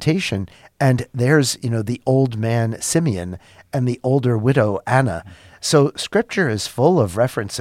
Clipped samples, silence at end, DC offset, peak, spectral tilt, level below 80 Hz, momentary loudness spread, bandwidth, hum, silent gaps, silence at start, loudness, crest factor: under 0.1%; 0 s; under 0.1%; -2 dBFS; -5.5 dB/octave; -50 dBFS; 10 LU; 15 kHz; none; none; 0 s; -19 LUFS; 18 dB